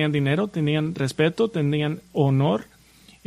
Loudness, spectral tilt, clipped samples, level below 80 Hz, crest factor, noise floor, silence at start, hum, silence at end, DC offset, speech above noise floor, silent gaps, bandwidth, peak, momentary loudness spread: -23 LUFS; -7 dB/octave; under 0.1%; -58 dBFS; 16 dB; -52 dBFS; 0 s; none; 0.65 s; under 0.1%; 30 dB; none; 12 kHz; -6 dBFS; 5 LU